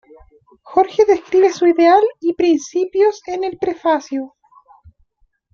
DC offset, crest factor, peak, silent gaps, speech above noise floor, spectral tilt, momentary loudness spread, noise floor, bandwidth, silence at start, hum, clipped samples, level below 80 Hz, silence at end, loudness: under 0.1%; 16 dB; -2 dBFS; none; 46 dB; -4 dB/octave; 11 LU; -61 dBFS; 7.2 kHz; 0.65 s; none; under 0.1%; -56 dBFS; 1.25 s; -16 LUFS